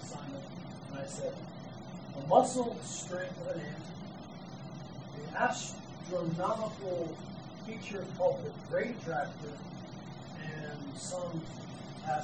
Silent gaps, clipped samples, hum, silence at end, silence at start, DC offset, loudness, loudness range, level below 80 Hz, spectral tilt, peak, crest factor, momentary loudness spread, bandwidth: none; under 0.1%; none; 0 s; 0 s; under 0.1%; -37 LUFS; 5 LU; -68 dBFS; -5 dB/octave; -10 dBFS; 26 dB; 13 LU; 10.5 kHz